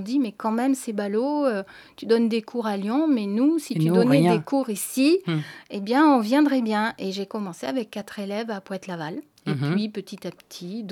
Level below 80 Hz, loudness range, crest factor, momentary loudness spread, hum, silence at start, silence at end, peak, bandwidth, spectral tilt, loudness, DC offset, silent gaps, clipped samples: -76 dBFS; 8 LU; 18 dB; 15 LU; none; 0 s; 0 s; -6 dBFS; 17.5 kHz; -6 dB/octave; -24 LUFS; under 0.1%; none; under 0.1%